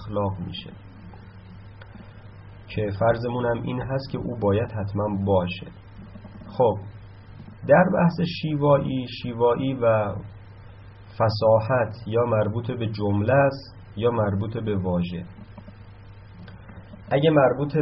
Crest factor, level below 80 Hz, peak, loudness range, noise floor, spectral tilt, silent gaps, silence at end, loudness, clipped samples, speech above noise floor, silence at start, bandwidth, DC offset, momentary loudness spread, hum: 20 dB; -50 dBFS; -4 dBFS; 6 LU; -44 dBFS; -6.5 dB/octave; none; 0 s; -23 LUFS; under 0.1%; 21 dB; 0 s; 5.8 kHz; under 0.1%; 25 LU; none